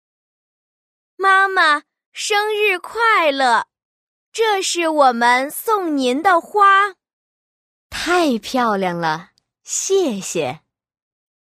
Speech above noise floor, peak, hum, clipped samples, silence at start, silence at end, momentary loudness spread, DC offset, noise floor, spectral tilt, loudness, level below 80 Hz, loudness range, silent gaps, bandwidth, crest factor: over 73 dB; -2 dBFS; none; under 0.1%; 1.2 s; 0.95 s; 11 LU; under 0.1%; under -90 dBFS; -2.5 dB/octave; -17 LUFS; -58 dBFS; 4 LU; 2.06-2.12 s, 3.85-4.32 s, 7.13-7.90 s; 15.5 kHz; 16 dB